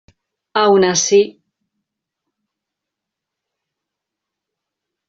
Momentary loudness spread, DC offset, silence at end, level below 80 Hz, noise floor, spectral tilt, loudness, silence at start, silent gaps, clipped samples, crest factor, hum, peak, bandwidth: 10 LU; under 0.1%; 3.8 s; -64 dBFS; -82 dBFS; -3 dB/octave; -14 LUFS; 0.55 s; none; under 0.1%; 20 dB; none; 0 dBFS; 7.8 kHz